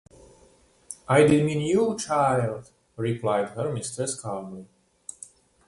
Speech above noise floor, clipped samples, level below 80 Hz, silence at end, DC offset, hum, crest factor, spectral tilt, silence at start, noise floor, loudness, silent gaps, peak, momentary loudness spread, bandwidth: 34 dB; under 0.1%; -58 dBFS; 1.05 s; under 0.1%; none; 20 dB; -5.5 dB/octave; 0.9 s; -58 dBFS; -24 LUFS; none; -6 dBFS; 23 LU; 11.5 kHz